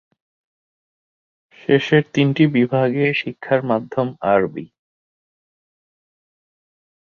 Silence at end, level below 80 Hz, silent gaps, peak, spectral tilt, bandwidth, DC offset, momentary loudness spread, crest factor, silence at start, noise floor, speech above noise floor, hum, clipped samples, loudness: 2.35 s; -62 dBFS; none; -2 dBFS; -7.5 dB/octave; 7 kHz; under 0.1%; 8 LU; 18 dB; 1.7 s; under -90 dBFS; over 72 dB; none; under 0.1%; -18 LUFS